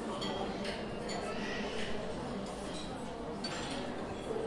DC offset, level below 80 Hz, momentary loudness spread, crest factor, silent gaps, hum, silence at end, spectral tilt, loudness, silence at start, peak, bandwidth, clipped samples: under 0.1%; -54 dBFS; 4 LU; 14 dB; none; none; 0 s; -4.5 dB/octave; -39 LUFS; 0 s; -24 dBFS; 11.5 kHz; under 0.1%